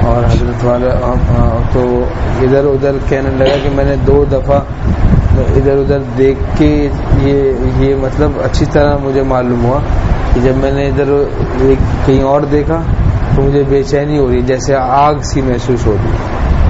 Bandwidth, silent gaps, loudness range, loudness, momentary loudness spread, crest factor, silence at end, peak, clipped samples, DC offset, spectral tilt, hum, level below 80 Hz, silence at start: 8 kHz; none; 1 LU; -12 LUFS; 4 LU; 10 dB; 0 s; 0 dBFS; under 0.1%; under 0.1%; -7.5 dB/octave; none; -16 dBFS; 0 s